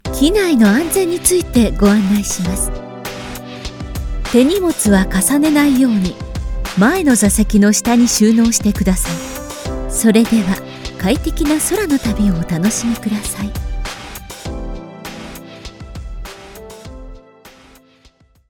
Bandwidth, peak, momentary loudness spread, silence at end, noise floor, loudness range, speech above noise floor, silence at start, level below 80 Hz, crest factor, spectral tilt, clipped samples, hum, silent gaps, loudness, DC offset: 19 kHz; 0 dBFS; 19 LU; 1 s; -51 dBFS; 17 LU; 37 dB; 0.05 s; -28 dBFS; 16 dB; -4.5 dB/octave; under 0.1%; none; none; -14 LUFS; under 0.1%